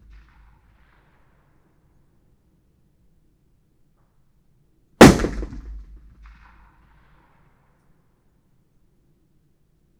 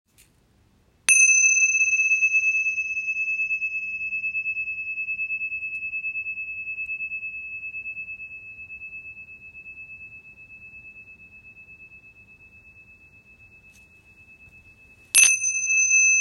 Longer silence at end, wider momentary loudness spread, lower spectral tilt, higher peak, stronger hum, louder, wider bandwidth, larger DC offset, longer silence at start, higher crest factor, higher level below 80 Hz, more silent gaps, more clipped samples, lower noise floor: first, 4.25 s vs 0 s; first, 31 LU vs 25 LU; first, -5.5 dB/octave vs 3 dB/octave; about the same, 0 dBFS vs -2 dBFS; neither; first, -14 LUFS vs -20 LUFS; first, over 20 kHz vs 13 kHz; neither; first, 5 s vs 1.1 s; about the same, 24 dB vs 24 dB; first, -38 dBFS vs -64 dBFS; neither; neither; about the same, -62 dBFS vs -61 dBFS